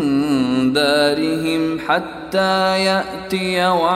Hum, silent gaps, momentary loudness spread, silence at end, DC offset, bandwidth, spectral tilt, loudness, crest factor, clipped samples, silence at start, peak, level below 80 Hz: none; none; 6 LU; 0 s; under 0.1%; 15.5 kHz; -5 dB/octave; -17 LUFS; 16 dB; under 0.1%; 0 s; -2 dBFS; -50 dBFS